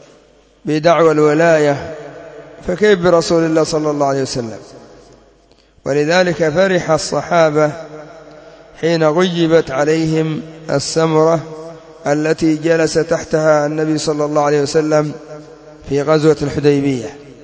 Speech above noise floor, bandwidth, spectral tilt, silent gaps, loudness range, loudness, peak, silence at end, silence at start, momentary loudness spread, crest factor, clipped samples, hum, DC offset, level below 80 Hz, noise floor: 36 dB; 8 kHz; -5.5 dB/octave; none; 3 LU; -14 LUFS; 0 dBFS; 0.1 s; 0.65 s; 17 LU; 16 dB; under 0.1%; none; under 0.1%; -46 dBFS; -50 dBFS